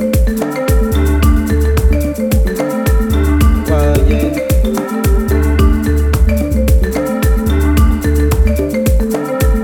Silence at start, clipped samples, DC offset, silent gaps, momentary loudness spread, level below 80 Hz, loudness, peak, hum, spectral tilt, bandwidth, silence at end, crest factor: 0 s; under 0.1%; under 0.1%; none; 3 LU; -14 dBFS; -13 LUFS; 0 dBFS; none; -7 dB/octave; 18.5 kHz; 0 s; 10 dB